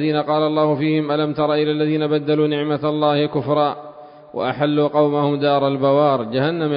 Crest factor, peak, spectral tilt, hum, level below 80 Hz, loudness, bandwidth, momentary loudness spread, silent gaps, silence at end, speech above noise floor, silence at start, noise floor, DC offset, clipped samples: 14 dB; -4 dBFS; -12 dB/octave; none; -62 dBFS; -18 LUFS; 5.2 kHz; 4 LU; none; 0 s; 22 dB; 0 s; -39 dBFS; under 0.1%; under 0.1%